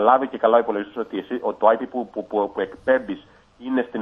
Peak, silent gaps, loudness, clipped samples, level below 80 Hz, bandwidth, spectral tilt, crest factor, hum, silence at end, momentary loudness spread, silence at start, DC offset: -2 dBFS; none; -22 LUFS; under 0.1%; -62 dBFS; 5.4 kHz; -7.5 dB/octave; 20 dB; none; 0 s; 11 LU; 0 s; under 0.1%